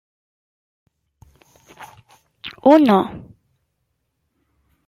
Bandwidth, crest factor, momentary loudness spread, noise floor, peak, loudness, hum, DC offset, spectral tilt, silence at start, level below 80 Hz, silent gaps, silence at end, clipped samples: 14.5 kHz; 20 dB; 24 LU; -72 dBFS; -2 dBFS; -15 LUFS; none; under 0.1%; -7.5 dB/octave; 1.8 s; -60 dBFS; none; 1.7 s; under 0.1%